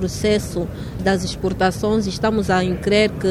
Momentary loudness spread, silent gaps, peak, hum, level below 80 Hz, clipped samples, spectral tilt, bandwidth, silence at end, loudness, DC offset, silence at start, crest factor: 7 LU; none; -4 dBFS; none; -36 dBFS; under 0.1%; -5.5 dB/octave; 15 kHz; 0 s; -20 LUFS; under 0.1%; 0 s; 16 dB